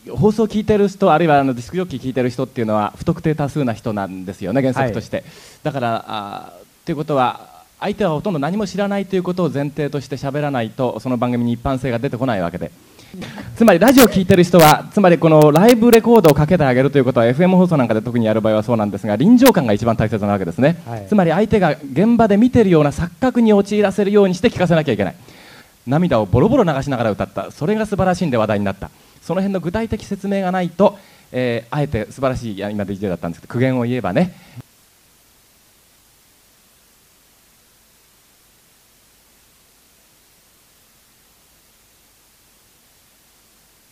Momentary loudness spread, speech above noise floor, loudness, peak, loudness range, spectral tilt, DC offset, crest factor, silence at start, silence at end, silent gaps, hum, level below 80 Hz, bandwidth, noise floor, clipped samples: 14 LU; 37 dB; -16 LUFS; 0 dBFS; 10 LU; -6.5 dB/octave; under 0.1%; 16 dB; 0.05 s; 9.3 s; none; none; -44 dBFS; 15.5 kHz; -53 dBFS; under 0.1%